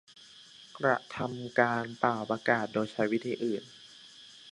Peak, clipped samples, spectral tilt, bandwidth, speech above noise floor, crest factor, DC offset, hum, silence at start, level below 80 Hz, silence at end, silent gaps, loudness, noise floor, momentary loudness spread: -8 dBFS; under 0.1%; -6 dB/octave; 11.5 kHz; 23 dB; 24 dB; under 0.1%; none; 0.2 s; -74 dBFS; 0 s; none; -31 LUFS; -54 dBFS; 21 LU